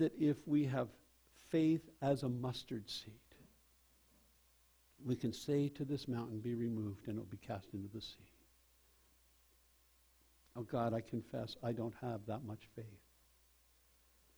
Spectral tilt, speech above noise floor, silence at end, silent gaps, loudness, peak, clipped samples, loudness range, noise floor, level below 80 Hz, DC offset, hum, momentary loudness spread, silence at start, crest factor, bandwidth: -7 dB/octave; 32 dB; 1.4 s; none; -41 LUFS; -22 dBFS; under 0.1%; 9 LU; -72 dBFS; -72 dBFS; under 0.1%; none; 15 LU; 0 s; 20 dB; over 20 kHz